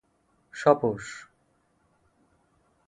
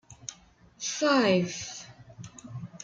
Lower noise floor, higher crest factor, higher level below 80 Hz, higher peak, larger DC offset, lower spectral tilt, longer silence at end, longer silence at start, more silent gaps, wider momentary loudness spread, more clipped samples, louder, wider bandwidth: first, -69 dBFS vs -56 dBFS; first, 26 dB vs 20 dB; about the same, -66 dBFS vs -66 dBFS; first, -6 dBFS vs -10 dBFS; neither; first, -6 dB/octave vs -4 dB/octave; first, 1.7 s vs 0 s; first, 0.55 s vs 0.1 s; neither; about the same, 22 LU vs 23 LU; neither; about the same, -25 LUFS vs -27 LUFS; first, 11 kHz vs 9.4 kHz